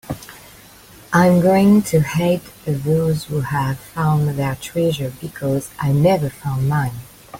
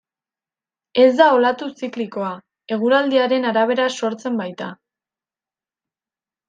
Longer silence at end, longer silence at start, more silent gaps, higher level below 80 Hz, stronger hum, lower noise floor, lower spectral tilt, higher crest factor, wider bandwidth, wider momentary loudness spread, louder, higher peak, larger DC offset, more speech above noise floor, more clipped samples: second, 0 s vs 1.75 s; second, 0.05 s vs 0.95 s; neither; first, -46 dBFS vs -74 dBFS; neither; second, -44 dBFS vs under -90 dBFS; first, -7 dB/octave vs -4.5 dB/octave; about the same, 16 dB vs 18 dB; first, 17 kHz vs 9 kHz; about the same, 13 LU vs 15 LU; about the same, -18 LUFS vs -18 LUFS; about the same, -2 dBFS vs -2 dBFS; neither; second, 26 dB vs over 72 dB; neither